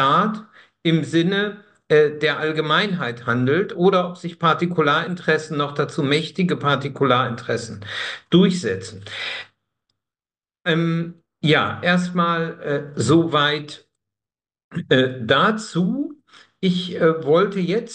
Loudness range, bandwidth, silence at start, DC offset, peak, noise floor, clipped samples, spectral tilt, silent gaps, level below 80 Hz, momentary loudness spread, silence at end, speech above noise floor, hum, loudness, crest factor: 3 LU; 9.8 kHz; 0 s; under 0.1%; -2 dBFS; under -90 dBFS; under 0.1%; -6 dB/octave; 14.64-14.71 s; -64 dBFS; 10 LU; 0 s; over 70 dB; none; -20 LUFS; 18 dB